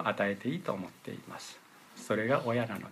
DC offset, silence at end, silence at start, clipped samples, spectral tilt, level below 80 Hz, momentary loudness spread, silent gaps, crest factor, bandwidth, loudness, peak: under 0.1%; 0 s; 0 s; under 0.1%; -6 dB/octave; -78 dBFS; 18 LU; none; 18 dB; 15.5 kHz; -33 LUFS; -16 dBFS